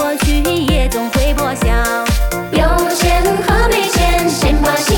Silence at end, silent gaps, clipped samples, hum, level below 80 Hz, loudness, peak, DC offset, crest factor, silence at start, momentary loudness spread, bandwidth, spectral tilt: 0 s; none; under 0.1%; none; -18 dBFS; -14 LUFS; -2 dBFS; under 0.1%; 12 dB; 0 s; 3 LU; 19 kHz; -4.5 dB/octave